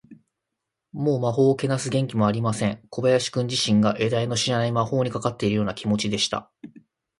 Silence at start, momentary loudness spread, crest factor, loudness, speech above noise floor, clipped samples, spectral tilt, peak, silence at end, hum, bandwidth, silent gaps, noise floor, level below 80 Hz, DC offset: 0.1 s; 5 LU; 18 dB; -23 LUFS; 60 dB; under 0.1%; -5.5 dB/octave; -6 dBFS; 0.5 s; none; 11.5 kHz; none; -83 dBFS; -56 dBFS; under 0.1%